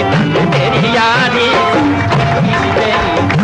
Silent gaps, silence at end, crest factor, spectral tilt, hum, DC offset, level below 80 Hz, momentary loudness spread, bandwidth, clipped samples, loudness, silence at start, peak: none; 0 s; 10 dB; -6 dB/octave; none; under 0.1%; -34 dBFS; 2 LU; 11 kHz; under 0.1%; -11 LUFS; 0 s; 0 dBFS